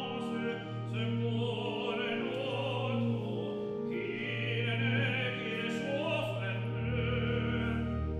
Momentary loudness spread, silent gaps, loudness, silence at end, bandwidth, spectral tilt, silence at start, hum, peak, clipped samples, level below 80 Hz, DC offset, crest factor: 5 LU; none; -34 LUFS; 0 s; 9.4 kHz; -7 dB/octave; 0 s; none; -20 dBFS; under 0.1%; -48 dBFS; under 0.1%; 14 dB